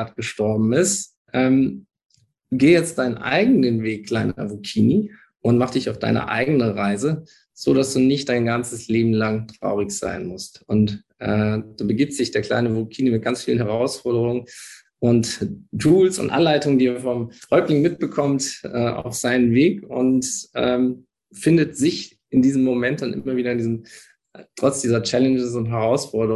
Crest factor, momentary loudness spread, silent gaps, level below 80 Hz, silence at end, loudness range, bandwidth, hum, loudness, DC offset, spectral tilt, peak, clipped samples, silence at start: 16 dB; 9 LU; 1.17-1.25 s, 2.05-2.09 s; -52 dBFS; 0 s; 3 LU; 12.5 kHz; none; -20 LUFS; under 0.1%; -5.5 dB/octave; -4 dBFS; under 0.1%; 0 s